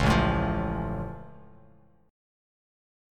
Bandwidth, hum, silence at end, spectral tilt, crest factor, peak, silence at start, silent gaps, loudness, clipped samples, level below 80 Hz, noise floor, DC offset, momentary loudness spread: 14.5 kHz; none; 1.7 s; -6.5 dB/octave; 20 dB; -10 dBFS; 0 s; none; -28 LUFS; under 0.1%; -38 dBFS; -58 dBFS; under 0.1%; 20 LU